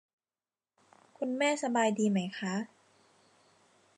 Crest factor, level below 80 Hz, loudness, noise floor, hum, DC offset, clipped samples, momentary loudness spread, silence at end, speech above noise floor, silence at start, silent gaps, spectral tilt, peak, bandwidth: 20 dB; -86 dBFS; -31 LUFS; under -90 dBFS; none; under 0.1%; under 0.1%; 10 LU; 1.3 s; over 59 dB; 1.2 s; none; -5 dB/octave; -16 dBFS; 11 kHz